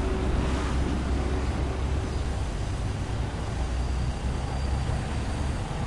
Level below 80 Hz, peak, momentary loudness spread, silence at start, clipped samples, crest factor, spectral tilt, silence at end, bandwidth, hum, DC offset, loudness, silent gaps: -30 dBFS; -16 dBFS; 3 LU; 0 s; under 0.1%; 12 dB; -6.5 dB/octave; 0 s; 11.5 kHz; none; under 0.1%; -30 LUFS; none